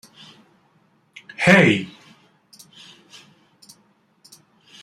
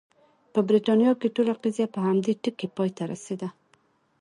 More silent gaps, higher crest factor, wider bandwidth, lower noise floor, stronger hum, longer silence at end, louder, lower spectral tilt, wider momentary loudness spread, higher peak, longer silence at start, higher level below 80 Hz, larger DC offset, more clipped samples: neither; first, 24 dB vs 16 dB; first, 13.5 kHz vs 11 kHz; second, -61 dBFS vs -65 dBFS; neither; first, 2.95 s vs 0.7 s; first, -16 LUFS vs -25 LUFS; second, -5.5 dB/octave vs -7 dB/octave; first, 30 LU vs 13 LU; first, -2 dBFS vs -10 dBFS; first, 1.4 s vs 0.55 s; first, -64 dBFS vs -74 dBFS; neither; neither